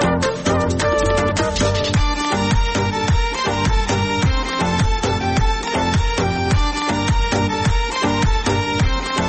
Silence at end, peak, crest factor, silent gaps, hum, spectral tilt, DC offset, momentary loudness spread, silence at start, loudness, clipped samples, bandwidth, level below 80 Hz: 0 s; -6 dBFS; 12 dB; none; none; -5 dB/octave; under 0.1%; 2 LU; 0 s; -19 LUFS; under 0.1%; 8.8 kHz; -24 dBFS